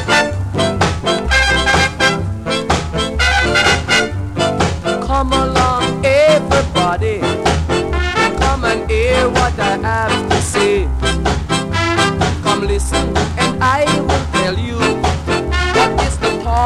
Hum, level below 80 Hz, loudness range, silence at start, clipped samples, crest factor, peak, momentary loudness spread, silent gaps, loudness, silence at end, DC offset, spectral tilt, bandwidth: none; -24 dBFS; 2 LU; 0 s; under 0.1%; 14 dB; 0 dBFS; 6 LU; none; -15 LUFS; 0 s; under 0.1%; -4.5 dB/octave; 14 kHz